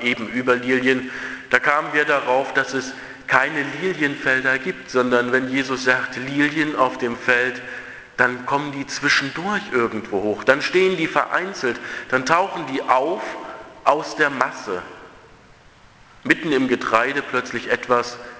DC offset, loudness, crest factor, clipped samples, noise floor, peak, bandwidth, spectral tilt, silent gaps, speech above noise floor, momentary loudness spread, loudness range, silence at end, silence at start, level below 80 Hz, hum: under 0.1%; -20 LUFS; 22 dB; under 0.1%; -49 dBFS; 0 dBFS; 8 kHz; -4 dB/octave; none; 28 dB; 10 LU; 3 LU; 0 s; 0 s; -58 dBFS; none